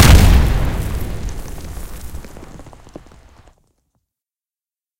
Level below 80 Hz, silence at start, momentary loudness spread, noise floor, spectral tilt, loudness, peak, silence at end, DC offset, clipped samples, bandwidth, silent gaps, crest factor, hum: -20 dBFS; 0 s; 28 LU; under -90 dBFS; -5 dB/octave; -16 LUFS; 0 dBFS; 2.3 s; under 0.1%; 0.2%; 17 kHz; none; 16 dB; none